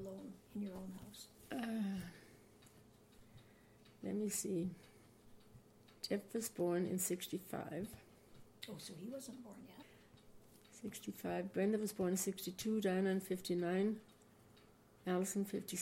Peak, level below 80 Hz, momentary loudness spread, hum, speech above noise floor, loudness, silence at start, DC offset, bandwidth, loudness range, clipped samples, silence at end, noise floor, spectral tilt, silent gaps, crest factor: -26 dBFS; -74 dBFS; 17 LU; none; 25 dB; -42 LUFS; 0 s; under 0.1%; 16.5 kHz; 10 LU; under 0.1%; 0 s; -66 dBFS; -5 dB/octave; none; 18 dB